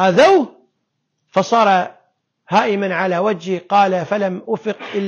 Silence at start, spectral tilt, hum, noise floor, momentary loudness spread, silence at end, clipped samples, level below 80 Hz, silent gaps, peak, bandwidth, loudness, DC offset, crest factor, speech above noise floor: 0 s; -5.5 dB/octave; none; -72 dBFS; 11 LU; 0 s; under 0.1%; -62 dBFS; none; -4 dBFS; 10 kHz; -16 LUFS; under 0.1%; 14 dB; 56 dB